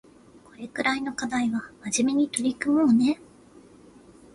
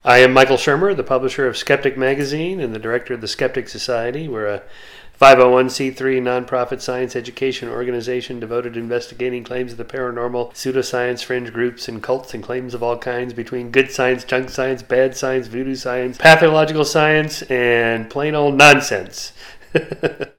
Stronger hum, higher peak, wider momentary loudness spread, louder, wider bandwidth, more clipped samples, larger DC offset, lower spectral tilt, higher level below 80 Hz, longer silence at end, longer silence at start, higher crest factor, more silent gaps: neither; second, -4 dBFS vs 0 dBFS; second, 12 LU vs 15 LU; second, -25 LUFS vs -17 LUFS; second, 11.5 kHz vs 18 kHz; second, under 0.1% vs 0.1%; neither; about the same, -3.5 dB/octave vs -4.5 dB/octave; second, -62 dBFS vs -50 dBFS; first, 1.2 s vs 0.1 s; first, 0.6 s vs 0.05 s; about the same, 22 dB vs 18 dB; neither